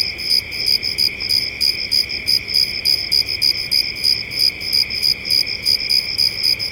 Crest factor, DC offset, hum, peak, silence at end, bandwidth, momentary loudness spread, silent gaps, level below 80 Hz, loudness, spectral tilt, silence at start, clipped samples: 14 dB; under 0.1%; none; -4 dBFS; 0 s; 17 kHz; 3 LU; none; -46 dBFS; -15 LUFS; 0 dB/octave; 0 s; under 0.1%